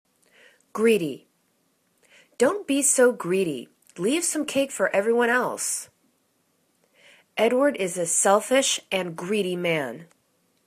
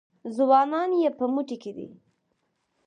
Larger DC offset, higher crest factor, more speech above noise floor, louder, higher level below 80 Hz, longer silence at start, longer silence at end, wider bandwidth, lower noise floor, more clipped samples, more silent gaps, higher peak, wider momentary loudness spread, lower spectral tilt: neither; about the same, 20 dB vs 18 dB; second, 46 dB vs 50 dB; about the same, -23 LUFS vs -24 LUFS; first, -72 dBFS vs -80 dBFS; first, 0.75 s vs 0.25 s; second, 0.65 s vs 0.95 s; first, 14 kHz vs 9.8 kHz; second, -69 dBFS vs -75 dBFS; neither; neither; about the same, -6 dBFS vs -8 dBFS; second, 14 LU vs 19 LU; second, -3 dB/octave vs -6.5 dB/octave